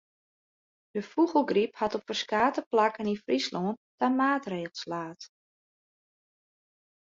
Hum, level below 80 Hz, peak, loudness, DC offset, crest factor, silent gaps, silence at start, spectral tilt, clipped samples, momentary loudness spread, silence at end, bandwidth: none; -72 dBFS; -10 dBFS; -29 LUFS; under 0.1%; 20 dB; 2.66-2.71 s, 3.77-3.98 s; 0.95 s; -5 dB/octave; under 0.1%; 12 LU; 1.8 s; 7.8 kHz